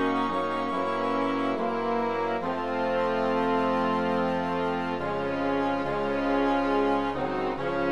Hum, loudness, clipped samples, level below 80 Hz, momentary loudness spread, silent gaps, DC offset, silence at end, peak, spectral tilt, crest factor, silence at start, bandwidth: none; -27 LUFS; under 0.1%; -54 dBFS; 4 LU; none; 0.6%; 0 s; -12 dBFS; -6.5 dB/octave; 14 dB; 0 s; 11 kHz